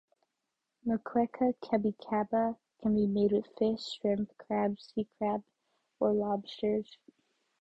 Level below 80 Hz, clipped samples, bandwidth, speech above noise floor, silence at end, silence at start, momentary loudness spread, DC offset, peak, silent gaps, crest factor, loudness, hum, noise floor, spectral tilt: -66 dBFS; under 0.1%; 8 kHz; 54 dB; 0.65 s; 0.85 s; 7 LU; under 0.1%; -14 dBFS; none; 18 dB; -32 LUFS; none; -86 dBFS; -7.5 dB/octave